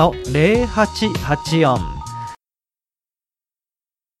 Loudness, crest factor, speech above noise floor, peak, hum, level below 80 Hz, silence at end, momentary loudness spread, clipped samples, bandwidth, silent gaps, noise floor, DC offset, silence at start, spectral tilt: -17 LUFS; 18 dB; over 73 dB; -2 dBFS; none; -36 dBFS; 1.85 s; 15 LU; under 0.1%; 14 kHz; none; under -90 dBFS; under 0.1%; 0 s; -6 dB/octave